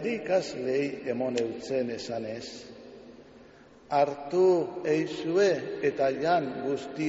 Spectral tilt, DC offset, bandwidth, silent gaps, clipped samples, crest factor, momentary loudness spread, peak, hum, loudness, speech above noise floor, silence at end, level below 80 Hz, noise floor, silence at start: -4.5 dB/octave; under 0.1%; 8 kHz; none; under 0.1%; 18 dB; 13 LU; -12 dBFS; none; -28 LUFS; 25 dB; 0 s; -68 dBFS; -53 dBFS; 0 s